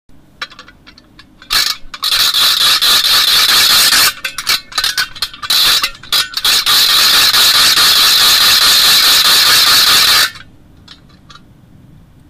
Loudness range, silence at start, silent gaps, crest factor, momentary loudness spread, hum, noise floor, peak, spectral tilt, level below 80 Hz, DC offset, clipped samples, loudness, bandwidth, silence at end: 5 LU; 0.4 s; none; 12 dB; 10 LU; none; -42 dBFS; 0 dBFS; 1.5 dB/octave; -42 dBFS; under 0.1%; under 0.1%; -7 LUFS; 16.5 kHz; 1.9 s